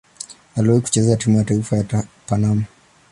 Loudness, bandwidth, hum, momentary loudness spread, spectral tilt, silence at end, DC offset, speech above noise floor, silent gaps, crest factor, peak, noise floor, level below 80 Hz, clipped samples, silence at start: -19 LUFS; 11.5 kHz; none; 13 LU; -6.5 dB/octave; 0.45 s; under 0.1%; 22 dB; none; 16 dB; -2 dBFS; -39 dBFS; -46 dBFS; under 0.1%; 0.2 s